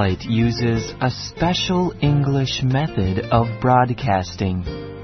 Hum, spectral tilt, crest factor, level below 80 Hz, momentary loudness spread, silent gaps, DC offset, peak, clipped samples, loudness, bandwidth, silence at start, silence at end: none; -6.5 dB/octave; 16 dB; -38 dBFS; 6 LU; none; under 0.1%; -4 dBFS; under 0.1%; -20 LUFS; 6.4 kHz; 0 s; 0 s